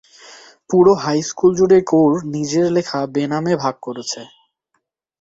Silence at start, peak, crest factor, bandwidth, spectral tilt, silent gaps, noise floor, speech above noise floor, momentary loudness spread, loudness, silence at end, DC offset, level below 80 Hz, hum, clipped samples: 0.3 s; -2 dBFS; 16 dB; 8 kHz; -5.5 dB/octave; none; -71 dBFS; 55 dB; 13 LU; -17 LUFS; 0.95 s; under 0.1%; -56 dBFS; none; under 0.1%